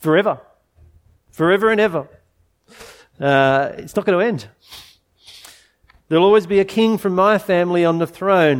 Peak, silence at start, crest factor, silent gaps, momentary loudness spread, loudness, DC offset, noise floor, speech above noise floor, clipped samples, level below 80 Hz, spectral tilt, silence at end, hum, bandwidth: -2 dBFS; 0 s; 18 dB; none; 9 LU; -17 LUFS; under 0.1%; -61 dBFS; 44 dB; under 0.1%; -56 dBFS; -6.5 dB/octave; 0 s; none; 17 kHz